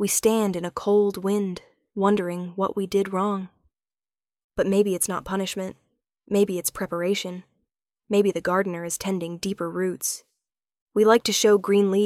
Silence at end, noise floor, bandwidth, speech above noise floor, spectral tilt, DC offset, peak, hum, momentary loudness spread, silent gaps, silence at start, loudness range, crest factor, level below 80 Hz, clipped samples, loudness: 0 s; under -90 dBFS; 16.5 kHz; over 67 dB; -4.5 dB/octave; under 0.1%; -4 dBFS; none; 13 LU; 4.44-4.50 s, 10.81-10.87 s; 0 s; 4 LU; 20 dB; -60 dBFS; under 0.1%; -24 LUFS